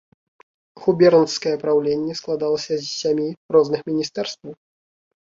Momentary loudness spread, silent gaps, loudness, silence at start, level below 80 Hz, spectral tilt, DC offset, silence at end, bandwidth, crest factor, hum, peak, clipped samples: 12 LU; 3.37-3.49 s; -20 LUFS; 0.75 s; -62 dBFS; -5 dB/octave; under 0.1%; 0.65 s; 7.8 kHz; 18 dB; none; -2 dBFS; under 0.1%